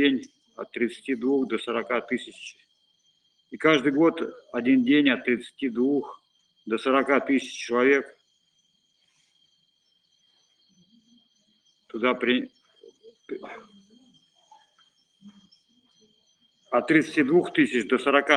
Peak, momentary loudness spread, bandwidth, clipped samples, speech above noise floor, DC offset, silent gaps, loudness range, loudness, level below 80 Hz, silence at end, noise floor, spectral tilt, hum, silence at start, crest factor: -2 dBFS; 20 LU; 10 kHz; under 0.1%; 45 dB; under 0.1%; none; 11 LU; -24 LUFS; -74 dBFS; 0 s; -69 dBFS; -5 dB/octave; none; 0 s; 24 dB